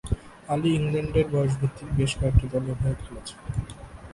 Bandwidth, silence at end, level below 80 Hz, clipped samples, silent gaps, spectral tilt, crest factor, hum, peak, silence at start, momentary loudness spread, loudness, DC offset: 11.5 kHz; 0 s; -36 dBFS; under 0.1%; none; -7 dB/octave; 22 dB; none; -4 dBFS; 0.05 s; 13 LU; -26 LUFS; under 0.1%